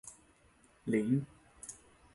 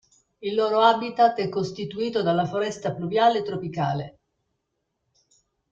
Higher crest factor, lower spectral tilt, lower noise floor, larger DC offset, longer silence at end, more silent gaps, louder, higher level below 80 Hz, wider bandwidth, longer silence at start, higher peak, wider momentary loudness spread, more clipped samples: about the same, 18 dB vs 20 dB; about the same, -7 dB/octave vs -6 dB/octave; second, -66 dBFS vs -78 dBFS; neither; second, 0.4 s vs 1.6 s; neither; second, -34 LUFS vs -24 LUFS; about the same, -68 dBFS vs -64 dBFS; first, 11.5 kHz vs 7.8 kHz; second, 0.05 s vs 0.4 s; second, -20 dBFS vs -4 dBFS; first, 21 LU vs 11 LU; neither